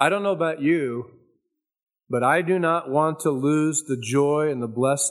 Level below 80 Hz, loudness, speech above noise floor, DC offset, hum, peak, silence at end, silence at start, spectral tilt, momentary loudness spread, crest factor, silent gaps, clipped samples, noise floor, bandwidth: -74 dBFS; -22 LUFS; 53 dB; under 0.1%; none; -2 dBFS; 0 s; 0 s; -5 dB/octave; 5 LU; 20 dB; none; under 0.1%; -75 dBFS; 13.5 kHz